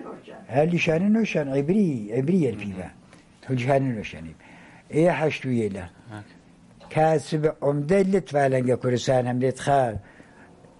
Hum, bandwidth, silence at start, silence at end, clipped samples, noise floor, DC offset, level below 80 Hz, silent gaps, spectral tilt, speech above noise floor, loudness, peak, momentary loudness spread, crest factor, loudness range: none; 11.5 kHz; 0 s; 0.8 s; under 0.1%; -50 dBFS; under 0.1%; -54 dBFS; none; -7 dB/octave; 27 dB; -23 LUFS; -8 dBFS; 17 LU; 16 dB; 4 LU